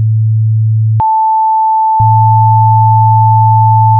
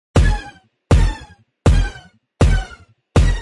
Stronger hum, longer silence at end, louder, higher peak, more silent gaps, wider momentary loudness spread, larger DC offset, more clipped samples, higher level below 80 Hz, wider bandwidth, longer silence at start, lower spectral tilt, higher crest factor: neither; about the same, 0 s vs 0 s; first, -8 LUFS vs -18 LUFS; about the same, 0 dBFS vs -2 dBFS; neither; second, 4 LU vs 14 LU; neither; neither; second, -42 dBFS vs -20 dBFS; second, 1.3 kHz vs 11.5 kHz; second, 0 s vs 0.15 s; first, -13 dB/octave vs -6.5 dB/octave; second, 8 dB vs 14 dB